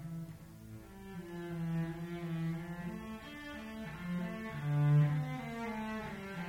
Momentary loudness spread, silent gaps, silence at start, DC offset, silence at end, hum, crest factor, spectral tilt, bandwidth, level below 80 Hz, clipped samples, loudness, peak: 19 LU; none; 0 s; under 0.1%; 0 s; none; 18 dB; -8 dB/octave; 15.5 kHz; -60 dBFS; under 0.1%; -38 LUFS; -20 dBFS